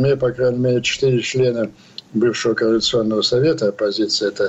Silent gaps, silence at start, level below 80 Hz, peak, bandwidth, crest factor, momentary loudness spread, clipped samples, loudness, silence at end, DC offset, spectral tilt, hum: none; 0 s; -52 dBFS; -8 dBFS; 8.2 kHz; 10 dB; 4 LU; under 0.1%; -18 LUFS; 0 s; under 0.1%; -5 dB/octave; none